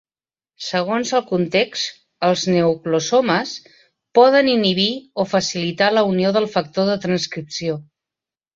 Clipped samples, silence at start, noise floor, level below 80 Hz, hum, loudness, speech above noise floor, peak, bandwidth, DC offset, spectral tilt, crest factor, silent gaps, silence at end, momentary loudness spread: under 0.1%; 0.6 s; under -90 dBFS; -60 dBFS; none; -18 LUFS; over 72 dB; -2 dBFS; 7.8 kHz; under 0.1%; -4.5 dB/octave; 18 dB; none; 0.75 s; 10 LU